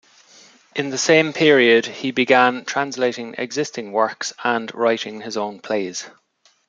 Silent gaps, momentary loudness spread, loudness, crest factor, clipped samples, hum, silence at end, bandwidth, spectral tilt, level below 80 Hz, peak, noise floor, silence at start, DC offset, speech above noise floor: none; 13 LU; -19 LUFS; 18 dB; under 0.1%; none; 0.6 s; 9.2 kHz; -3.5 dB/octave; -70 dBFS; -2 dBFS; -50 dBFS; 0.75 s; under 0.1%; 30 dB